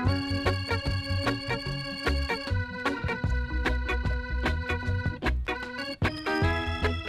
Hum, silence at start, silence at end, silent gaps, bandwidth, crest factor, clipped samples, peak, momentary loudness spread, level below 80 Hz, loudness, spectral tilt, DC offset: none; 0 s; 0 s; none; 14 kHz; 16 dB; under 0.1%; -12 dBFS; 4 LU; -34 dBFS; -29 LUFS; -6 dB/octave; under 0.1%